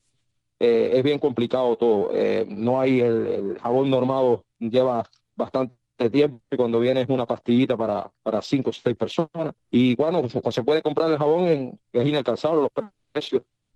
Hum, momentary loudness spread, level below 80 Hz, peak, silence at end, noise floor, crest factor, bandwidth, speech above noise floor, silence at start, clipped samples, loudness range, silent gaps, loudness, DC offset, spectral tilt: none; 7 LU; -66 dBFS; -6 dBFS; 0.35 s; -75 dBFS; 16 dB; 8.4 kHz; 53 dB; 0.6 s; under 0.1%; 2 LU; none; -23 LUFS; under 0.1%; -7.5 dB/octave